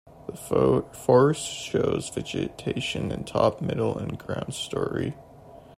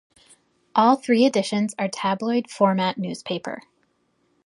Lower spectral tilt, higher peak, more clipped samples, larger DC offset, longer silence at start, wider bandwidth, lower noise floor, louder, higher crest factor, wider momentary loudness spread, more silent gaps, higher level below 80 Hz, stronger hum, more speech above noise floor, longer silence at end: about the same, -5.5 dB/octave vs -5.5 dB/octave; about the same, -6 dBFS vs -4 dBFS; neither; neither; second, 0.15 s vs 0.75 s; first, 16 kHz vs 11.5 kHz; second, -48 dBFS vs -68 dBFS; second, -26 LUFS vs -22 LUFS; about the same, 20 dB vs 20 dB; about the same, 12 LU vs 12 LU; neither; first, -52 dBFS vs -70 dBFS; neither; second, 22 dB vs 46 dB; second, 0.2 s vs 0.85 s